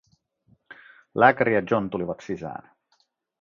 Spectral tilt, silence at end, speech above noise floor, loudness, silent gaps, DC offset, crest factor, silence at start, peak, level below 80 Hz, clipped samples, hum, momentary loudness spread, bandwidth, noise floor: -7.5 dB/octave; 0.85 s; 46 dB; -23 LUFS; none; under 0.1%; 24 dB; 0.7 s; -2 dBFS; -62 dBFS; under 0.1%; none; 17 LU; 7.4 kHz; -69 dBFS